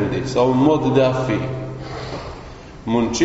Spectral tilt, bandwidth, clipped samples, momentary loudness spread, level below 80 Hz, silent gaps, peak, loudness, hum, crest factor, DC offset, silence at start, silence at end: -6 dB/octave; 8 kHz; under 0.1%; 17 LU; -40 dBFS; none; -2 dBFS; -19 LUFS; none; 16 dB; under 0.1%; 0 s; 0 s